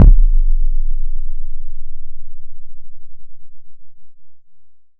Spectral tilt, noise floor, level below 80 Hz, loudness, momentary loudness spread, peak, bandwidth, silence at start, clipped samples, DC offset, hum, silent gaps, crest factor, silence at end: -11.5 dB/octave; -40 dBFS; -14 dBFS; -22 LUFS; 24 LU; 0 dBFS; 1.1 kHz; 0 s; 0.4%; under 0.1%; none; none; 12 dB; 0.2 s